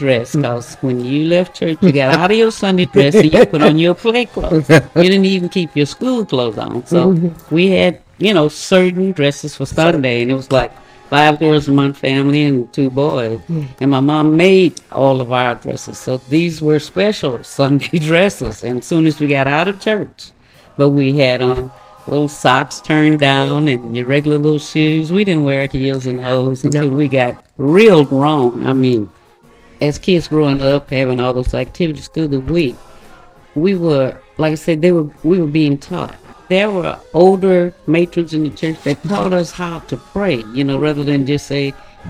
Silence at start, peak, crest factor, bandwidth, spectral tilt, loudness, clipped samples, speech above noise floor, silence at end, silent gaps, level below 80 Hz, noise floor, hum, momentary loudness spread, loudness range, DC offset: 0 s; 0 dBFS; 14 dB; 15 kHz; -6.5 dB/octave; -14 LUFS; under 0.1%; 32 dB; 0 s; none; -40 dBFS; -46 dBFS; none; 10 LU; 5 LU; under 0.1%